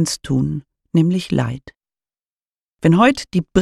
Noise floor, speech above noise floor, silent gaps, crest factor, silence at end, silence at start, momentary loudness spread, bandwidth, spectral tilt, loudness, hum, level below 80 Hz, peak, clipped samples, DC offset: under -90 dBFS; over 73 dB; 2.26-2.46 s, 2.62-2.72 s; 18 dB; 0 s; 0 s; 12 LU; 13 kHz; -6 dB/octave; -18 LUFS; none; -46 dBFS; -2 dBFS; under 0.1%; under 0.1%